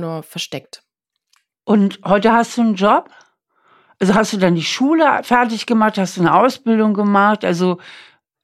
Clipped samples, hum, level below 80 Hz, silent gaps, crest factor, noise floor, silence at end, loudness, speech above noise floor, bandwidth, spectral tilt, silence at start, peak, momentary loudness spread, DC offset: under 0.1%; none; -56 dBFS; none; 16 dB; -64 dBFS; 0.45 s; -15 LUFS; 49 dB; 13.5 kHz; -5.5 dB/octave; 0 s; -2 dBFS; 12 LU; under 0.1%